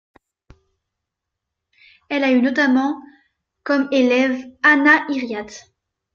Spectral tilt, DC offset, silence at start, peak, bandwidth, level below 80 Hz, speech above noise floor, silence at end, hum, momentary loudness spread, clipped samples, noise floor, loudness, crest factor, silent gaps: -4 dB/octave; under 0.1%; 2.1 s; -2 dBFS; 7.2 kHz; -62 dBFS; 64 dB; 0.55 s; none; 16 LU; under 0.1%; -82 dBFS; -17 LUFS; 20 dB; none